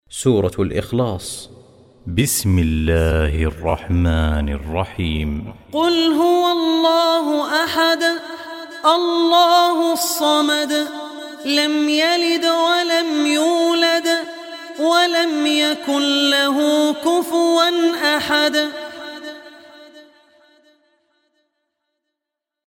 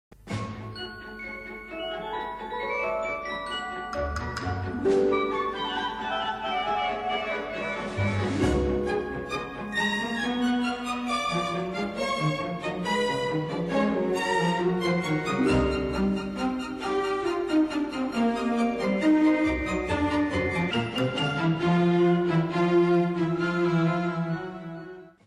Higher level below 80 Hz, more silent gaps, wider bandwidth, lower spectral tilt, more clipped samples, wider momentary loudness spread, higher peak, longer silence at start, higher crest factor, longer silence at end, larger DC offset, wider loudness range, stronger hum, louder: first, -32 dBFS vs -44 dBFS; neither; first, 16.5 kHz vs 12.5 kHz; second, -4.5 dB/octave vs -6 dB/octave; neither; first, 13 LU vs 10 LU; first, 0 dBFS vs -12 dBFS; second, 0.1 s vs 0.25 s; about the same, 18 dB vs 14 dB; first, 2.65 s vs 0.15 s; neither; about the same, 4 LU vs 4 LU; neither; first, -17 LUFS vs -27 LUFS